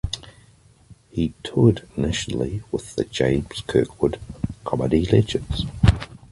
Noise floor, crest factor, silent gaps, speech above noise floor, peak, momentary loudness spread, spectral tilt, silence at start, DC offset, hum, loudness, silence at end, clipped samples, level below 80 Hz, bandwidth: -53 dBFS; 20 dB; none; 32 dB; -2 dBFS; 12 LU; -6.5 dB/octave; 0.05 s; under 0.1%; none; -23 LUFS; 0.15 s; under 0.1%; -34 dBFS; 11.5 kHz